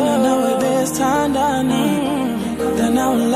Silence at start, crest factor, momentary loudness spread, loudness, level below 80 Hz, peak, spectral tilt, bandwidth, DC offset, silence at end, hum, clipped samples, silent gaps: 0 s; 12 dB; 4 LU; -17 LUFS; -44 dBFS; -4 dBFS; -5 dB/octave; 16 kHz; under 0.1%; 0 s; none; under 0.1%; none